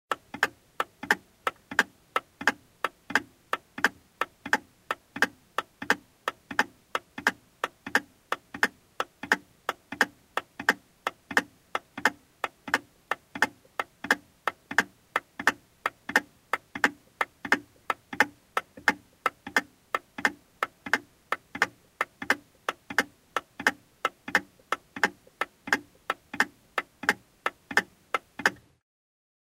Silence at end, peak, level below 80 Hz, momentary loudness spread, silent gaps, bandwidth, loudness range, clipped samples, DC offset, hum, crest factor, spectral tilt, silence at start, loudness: 0.9 s; -4 dBFS; -70 dBFS; 8 LU; none; 16 kHz; 2 LU; under 0.1%; under 0.1%; none; 28 dB; -2 dB/octave; 0.1 s; -30 LUFS